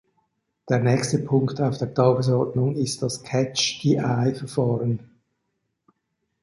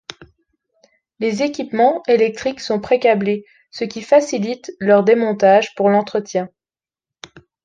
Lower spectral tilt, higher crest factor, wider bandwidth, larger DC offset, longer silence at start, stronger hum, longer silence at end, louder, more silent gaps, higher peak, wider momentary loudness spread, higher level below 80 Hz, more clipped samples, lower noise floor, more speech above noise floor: about the same, -5.5 dB/octave vs -5.5 dB/octave; about the same, 18 dB vs 16 dB; first, 11.5 kHz vs 9.2 kHz; neither; second, 0.65 s vs 1.2 s; neither; first, 1.45 s vs 1.2 s; second, -23 LUFS vs -17 LUFS; neither; second, -6 dBFS vs -2 dBFS; second, 5 LU vs 13 LU; about the same, -60 dBFS vs -60 dBFS; neither; second, -77 dBFS vs under -90 dBFS; second, 54 dB vs over 74 dB